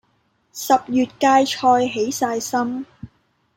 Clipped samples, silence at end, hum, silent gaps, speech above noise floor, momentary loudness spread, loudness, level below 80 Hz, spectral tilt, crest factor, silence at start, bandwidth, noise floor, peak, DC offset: under 0.1%; 0.5 s; none; none; 46 dB; 15 LU; -19 LUFS; -60 dBFS; -3.5 dB/octave; 18 dB; 0.55 s; 16.5 kHz; -65 dBFS; -2 dBFS; under 0.1%